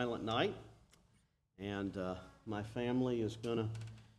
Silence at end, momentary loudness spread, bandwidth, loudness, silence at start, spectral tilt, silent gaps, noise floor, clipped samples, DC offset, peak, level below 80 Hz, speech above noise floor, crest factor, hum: 0.1 s; 12 LU; 12 kHz; -40 LUFS; 0 s; -6.5 dB/octave; none; -75 dBFS; under 0.1%; under 0.1%; -22 dBFS; -66 dBFS; 36 dB; 18 dB; none